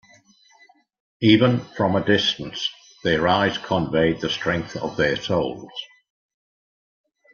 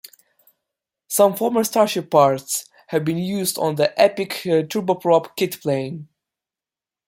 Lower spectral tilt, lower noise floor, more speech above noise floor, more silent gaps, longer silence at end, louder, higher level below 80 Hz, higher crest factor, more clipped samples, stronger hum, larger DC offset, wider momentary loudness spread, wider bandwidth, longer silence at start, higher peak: about the same, -5.5 dB/octave vs -4.5 dB/octave; second, -56 dBFS vs under -90 dBFS; second, 35 dB vs over 71 dB; neither; first, 1.5 s vs 1.05 s; about the same, -21 LUFS vs -20 LUFS; first, -54 dBFS vs -66 dBFS; about the same, 20 dB vs 20 dB; neither; neither; neither; about the same, 11 LU vs 9 LU; second, 7 kHz vs 16.5 kHz; about the same, 1.2 s vs 1.1 s; about the same, -2 dBFS vs -2 dBFS